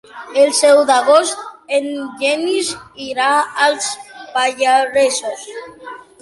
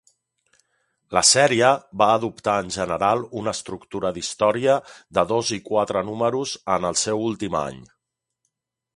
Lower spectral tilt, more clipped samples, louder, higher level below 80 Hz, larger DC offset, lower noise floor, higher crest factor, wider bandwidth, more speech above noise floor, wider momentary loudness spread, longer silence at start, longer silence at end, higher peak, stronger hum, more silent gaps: second, -0.5 dB/octave vs -3 dB/octave; neither; first, -15 LUFS vs -21 LUFS; second, -62 dBFS vs -56 dBFS; neither; second, -35 dBFS vs -81 dBFS; second, 16 dB vs 22 dB; about the same, 11.5 kHz vs 11.5 kHz; second, 20 dB vs 60 dB; first, 18 LU vs 11 LU; second, 0.15 s vs 1.1 s; second, 0.25 s vs 1.15 s; about the same, 0 dBFS vs -2 dBFS; neither; neither